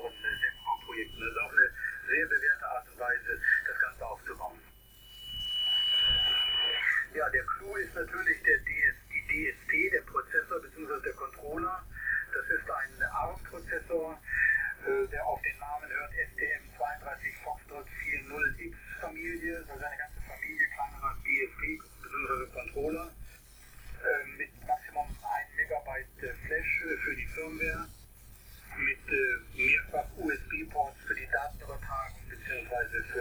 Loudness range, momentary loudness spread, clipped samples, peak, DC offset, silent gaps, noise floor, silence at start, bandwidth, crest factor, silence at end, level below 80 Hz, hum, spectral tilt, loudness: 8 LU; 14 LU; under 0.1%; -12 dBFS; under 0.1%; none; -55 dBFS; 0 s; over 20 kHz; 20 dB; 0 s; -50 dBFS; none; -3 dB/octave; -31 LUFS